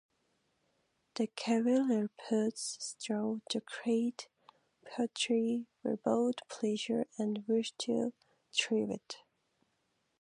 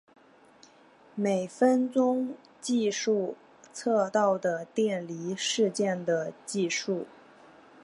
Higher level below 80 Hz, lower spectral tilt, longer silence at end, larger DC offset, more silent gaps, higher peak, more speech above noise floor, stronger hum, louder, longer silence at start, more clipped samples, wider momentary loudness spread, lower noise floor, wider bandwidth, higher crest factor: about the same, -84 dBFS vs -82 dBFS; about the same, -4 dB/octave vs -4.5 dB/octave; first, 1.05 s vs 0.75 s; neither; neither; second, -16 dBFS vs -12 dBFS; first, 45 dB vs 30 dB; neither; second, -35 LUFS vs -28 LUFS; about the same, 1.15 s vs 1.15 s; neither; second, 9 LU vs 12 LU; first, -79 dBFS vs -57 dBFS; about the same, 11 kHz vs 11.5 kHz; about the same, 18 dB vs 18 dB